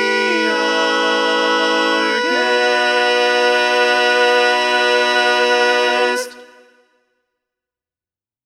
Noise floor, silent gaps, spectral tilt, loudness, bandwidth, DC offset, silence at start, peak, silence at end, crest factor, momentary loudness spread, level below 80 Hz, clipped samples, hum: under -90 dBFS; none; -1 dB/octave; -14 LUFS; 13.5 kHz; under 0.1%; 0 s; -2 dBFS; 2 s; 14 dB; 3 LU; -76 dBFS; under 0.1%; none